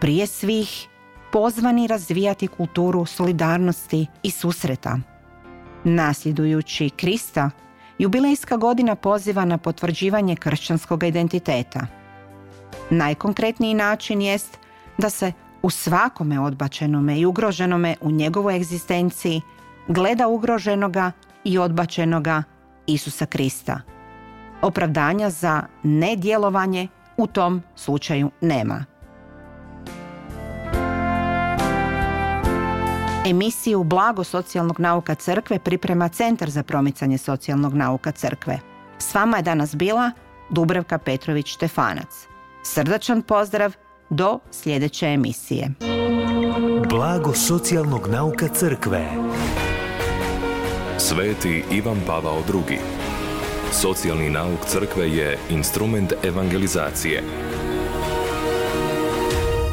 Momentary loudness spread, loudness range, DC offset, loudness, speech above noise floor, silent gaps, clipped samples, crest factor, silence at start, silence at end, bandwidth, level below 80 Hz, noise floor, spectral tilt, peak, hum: 7 LU; 3 LU; under 0.1%; -22 LUFS; 23 dB; none; under 0.1%; 16 dB; 0 s; 0 s; 17 kHz; -40 dBFS; -44 dBFS; -5.5 dB/octave; -6 dBFS; none